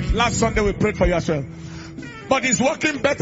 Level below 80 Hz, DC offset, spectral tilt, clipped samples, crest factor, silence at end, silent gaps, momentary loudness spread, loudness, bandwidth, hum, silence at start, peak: -32 dBFS; under 0.1%; -4.5 dB/octave; under 0.1%; 18 dB; 0 s; none; 16 LU; -20 LUFS; 8 kHz; none; 0 s; -4 dBFS